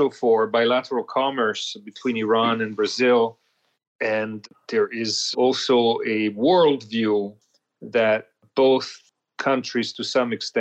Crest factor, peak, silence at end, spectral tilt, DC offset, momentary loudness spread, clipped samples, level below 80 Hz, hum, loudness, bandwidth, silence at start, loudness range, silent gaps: 14 dB; -8 dBFS; 0 s; -4 dB/octave; under 0.1%; 9 LU; under 0.1%; -72 dBFS; none; -22 LUFS; 8.8 kHz; 0 s; 2 LU; 3.87-3.99 s